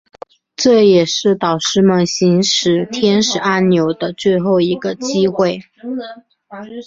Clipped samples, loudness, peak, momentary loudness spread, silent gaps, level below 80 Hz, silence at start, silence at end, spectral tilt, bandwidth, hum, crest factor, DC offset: under 0.1%; -14 LUFS; -2 dBFS; 15 LU; none; -56 dBFS; 0.6 s; 0.05 s; -5 dB/octave; 8 kHz; none; 14 dB; under 0.1%